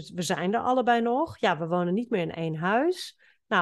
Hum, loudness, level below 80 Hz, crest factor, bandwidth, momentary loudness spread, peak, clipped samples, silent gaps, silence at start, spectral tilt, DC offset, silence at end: none; -27 LUFS; -68 dBFS; 18 dB; 12.5 kHz; 6 LU; -10 dBFS; under 0.1%; none; 0 s; -5.5 dB/octave; under 0.1%; 0 s